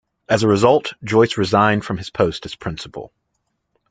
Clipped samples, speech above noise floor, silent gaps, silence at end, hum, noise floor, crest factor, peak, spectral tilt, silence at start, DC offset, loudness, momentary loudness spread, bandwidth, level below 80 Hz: under 0.1%; 55 dB; none; 0.85 s; none; -72 dBFS; 18 dB; -2 dBFS; -6 dB/octave; 0.3 s; under 0.1%; -18 LUFS; 14 LU; 9.4 kHz; -50 dBFS